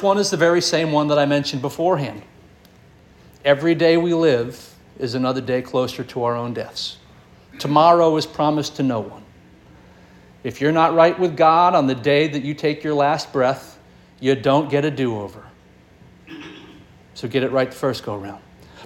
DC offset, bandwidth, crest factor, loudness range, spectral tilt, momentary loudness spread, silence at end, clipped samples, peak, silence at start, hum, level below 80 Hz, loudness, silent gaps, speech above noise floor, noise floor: under 0.1%; 17 kHz; 18 dB; 7 LU; -5.5 dB/octave; 16 LU; 0 s; under 0.1%; -2 dBFS; 0 s; none; -56 dBFS; -19 LUFS; none; 31 dB; -50 dBFS